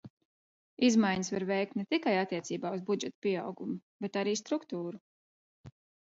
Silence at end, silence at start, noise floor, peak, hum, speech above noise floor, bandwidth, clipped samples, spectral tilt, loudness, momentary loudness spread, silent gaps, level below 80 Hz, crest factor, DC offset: 0.35 s; 0.05 s; under -90 dBFS; -16 dBFS; none; over 58 dB; 8 kHz; under 0.1%; -4.5 dB/octave; -33 LUFS; 12 LU; 0.10-0.17 s, 0.25-0.77 s, 3.15-3.22 s, 3.82-4.00 s, 5.01-5.64 s; -74 dBFS; 18 dB; under 0.1%